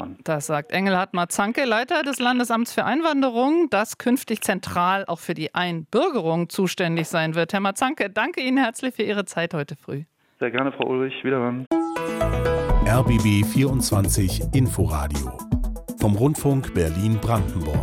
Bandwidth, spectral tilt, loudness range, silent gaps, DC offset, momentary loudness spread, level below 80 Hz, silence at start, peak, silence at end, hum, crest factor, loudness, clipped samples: 16.5 kHz; -5.5 dB/octave; 4 LU; 11.67-11.71 s; under 0.1%; 7 LU; -34 dBFS; 0 s; -4 dBFS; 0 s; none; 18 dB; -22 LUFS; under 0.1%